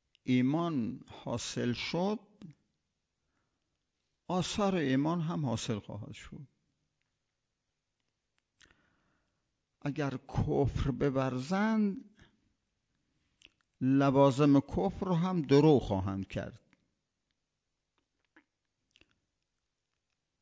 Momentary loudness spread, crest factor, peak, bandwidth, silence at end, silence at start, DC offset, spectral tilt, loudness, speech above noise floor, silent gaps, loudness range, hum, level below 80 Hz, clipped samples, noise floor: 16 LU; 22 dB; -12 dBFS; 8 kHz; 3.85 s; 0.25 s; under 0.1%; -7 dB/octave; -31 LUFS; 56 dB; none; 14 LU; none; -54 dBFS; under 0.1%; -86 dBFS